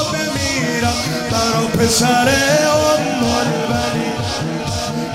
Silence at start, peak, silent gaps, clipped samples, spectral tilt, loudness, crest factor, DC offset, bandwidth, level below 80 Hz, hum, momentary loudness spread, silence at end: 0 s; -2 dBFS; none; under 0.1%; -4 dB/octave; -16 LUFS; 14 dB; under 0.1%; 16 kHz; -40 dBFS; none; 8 LU; 0 s